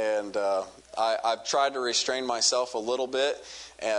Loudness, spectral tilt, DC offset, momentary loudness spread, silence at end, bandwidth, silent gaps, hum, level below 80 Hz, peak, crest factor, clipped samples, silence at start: -27 LUFS; -0.5 dB/octave; under 0.1%; 9 LU; 0 s; 11 kHz; none; none; -68 dBFS; -10 dBFS; 18 dB; under 0.1%; 0 s